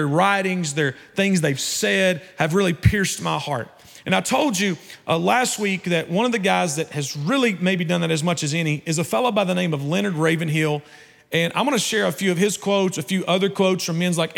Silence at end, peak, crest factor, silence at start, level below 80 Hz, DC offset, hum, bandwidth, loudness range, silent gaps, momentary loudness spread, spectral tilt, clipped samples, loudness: 0 s; -4 dBFS; 18 dB; 0 s; -48 dBFS; under 0.1%; none; 17.5 kHz; 1 LU; none; 5 LU; -4.5 dB/octave; under 0.1%; -21 LUFS